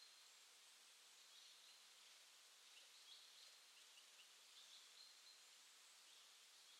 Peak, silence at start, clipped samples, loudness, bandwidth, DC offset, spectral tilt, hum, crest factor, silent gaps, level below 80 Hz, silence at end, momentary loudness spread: -52 dBFS; 0 s; under 0.1%; -64 LUFS; 15.5 kHz; under 0.1%; 3.5 dB/octave; none; 16 dB; none; under -90 dBFS; 0 s; 3 LU